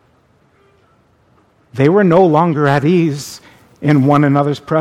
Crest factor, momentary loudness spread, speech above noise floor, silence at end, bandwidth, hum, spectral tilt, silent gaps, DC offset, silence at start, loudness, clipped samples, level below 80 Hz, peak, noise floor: 14 dB; 12 LU; 42 dB; 0 s; 14 kHz; none; -7.5 dB/octave; none; under 0.1%; 1.75 s; -12 LUFS; under 0.1%; -54 dBFS; 0 dBFS; -54 dBFS